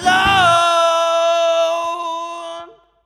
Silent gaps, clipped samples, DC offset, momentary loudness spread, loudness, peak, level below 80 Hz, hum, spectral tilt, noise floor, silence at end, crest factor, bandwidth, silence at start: none; under 0.1%; under 0.1%; 17 LU; -15 LUFS; -2 dBFS; -46 dBFS; none; -2.5 dB/octave; -37 dBFS; 0.4 s; 14 dB; 13.5 kHz; 0 s